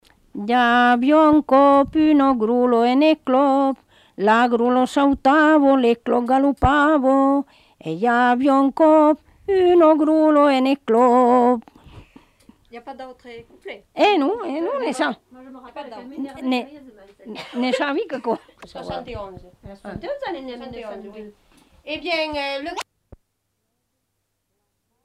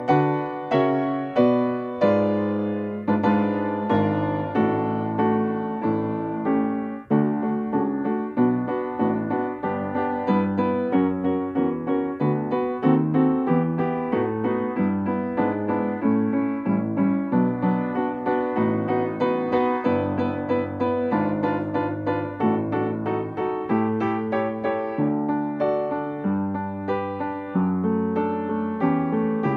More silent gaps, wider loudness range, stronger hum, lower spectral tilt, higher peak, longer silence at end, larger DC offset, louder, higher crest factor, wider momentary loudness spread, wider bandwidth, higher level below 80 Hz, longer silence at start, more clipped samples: neither; first, 13 LU vs 2 LU; neither; second, -6 dB/octave vs -10 dB/octave; first, -2 dBFS vs -6 dBFS; first, 2.2 s vs 0 s; neither; first, -17 LUFS vs -24 LUFS; about the same, 18 dB vs 16 dB; first, 22 LU vs 5 LU; first, 12 kHz vs 5 kHz; first, -46 dBFS vs -60 dBFS; first, 0.35 s vs 0 s; neither